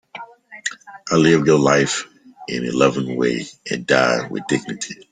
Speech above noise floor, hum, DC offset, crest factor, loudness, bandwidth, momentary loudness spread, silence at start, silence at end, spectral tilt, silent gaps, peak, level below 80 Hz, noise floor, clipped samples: 20 dB; none; under 0.1%; 18 dB; -19 LUFS; 9.6 kHz; 21 LU; 0.15 s; 0.1 s; -4.5 dB/octave; none; -2 dBFS; -56 dBFS; -38 dBFS; under 0.1%